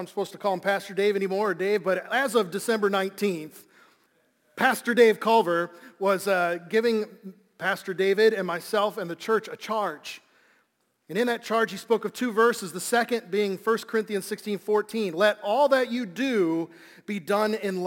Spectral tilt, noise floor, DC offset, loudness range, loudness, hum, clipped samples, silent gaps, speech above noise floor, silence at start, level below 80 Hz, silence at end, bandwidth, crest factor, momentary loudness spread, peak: -4.5 dB/octave; -71 dBFS; under 0.1%; 4 LU; -25 LUFS; none; under 0.1%; none; 46 dB; 0 s; -78 dBFS; 0 s; 17 kHz; 20 dB; 10 LU; -6 dBFS